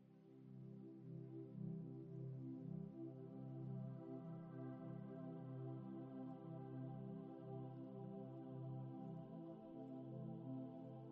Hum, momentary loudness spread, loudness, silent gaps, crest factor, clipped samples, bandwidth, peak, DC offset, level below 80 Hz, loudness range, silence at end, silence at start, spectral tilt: none; 4 LU; -54 LUFS; none; 12 dB; under 0.1%; 3.9 kHz; -40 dBFS; under 0.1%; -84 dBFS; 1 LU; 0 s; 0 s; -10.5 dB/octave